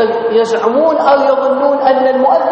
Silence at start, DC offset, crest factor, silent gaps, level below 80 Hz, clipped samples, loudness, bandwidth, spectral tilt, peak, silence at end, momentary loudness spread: 0 s; under 0.1%; 10 dB; none; -58 dBFS; under 0.1%; -11 LUFS; 8.6 kHz; -5 dB/octave; 0 dBFS; 0 s; 3 LU